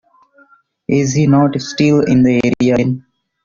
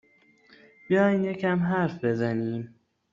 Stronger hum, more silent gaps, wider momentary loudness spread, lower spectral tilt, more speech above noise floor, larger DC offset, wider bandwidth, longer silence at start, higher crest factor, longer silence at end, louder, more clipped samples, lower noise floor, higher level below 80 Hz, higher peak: neither; neither; about the same, 8 LU vs 10 LU; about the same, -6.5 dB/octave vs -7 dB/octave; about the same, 38 dB vs 35 dB; neither; about the same, 7.4 kHz vs 7.4 kHz; about the same, 0.9 s vs 0.9 s; about the same, 12 dB vs 16 dB; about the same, 0.45 s vs 0.45 s; first, -13 LUFS vs -26 LUFS; neither; second, -51 dBFS vs -60 dBFS; first, -48 dBFS vs -68 dBFS; first, -2 dBFS vs -12 dBFS